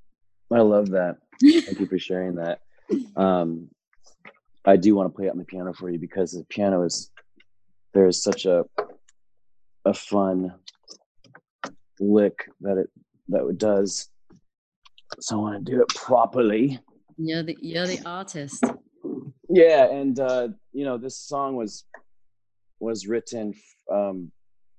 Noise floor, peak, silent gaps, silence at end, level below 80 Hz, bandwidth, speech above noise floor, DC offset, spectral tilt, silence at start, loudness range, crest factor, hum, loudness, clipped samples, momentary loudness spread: -78 dBFS; -4 dBFS; 11.06-11.15 s, 11.50-11.59 s, 14.58-14.82 s; 0.5 s; -64 dBFS; 9.6 kHz; 56 dB; under 0.1%; -5.5 dB/octave; 0.5 s; 7 LU; 20 dB; none; -23 LUFS; under 0.1%; 17 LU